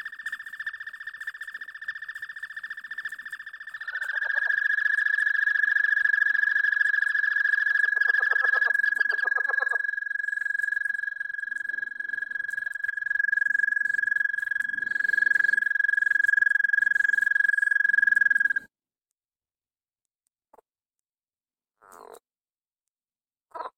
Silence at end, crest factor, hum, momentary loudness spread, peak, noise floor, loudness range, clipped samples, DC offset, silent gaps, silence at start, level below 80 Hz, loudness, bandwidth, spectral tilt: 0.1 s; 16 dB; none; 15 LU; -10 dBFS; under -90 dBFS; 10 LU; under 0.1%; under 0.1%; 20.15-20.19 s; 0 s; -80 dBFS; -23 LUFS; 14.5 kHz; 0.5 dB/octave